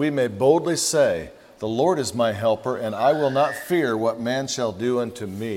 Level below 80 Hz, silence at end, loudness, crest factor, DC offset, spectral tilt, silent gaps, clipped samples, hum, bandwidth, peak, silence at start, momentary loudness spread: -60 dBFS; 0 s; -22 LUFS; 18 dB; under 0.1%; -4.5 dB/octave; none; under 0.1%; none; 16 kHz; -4 dBFS; 0 s; 9 LU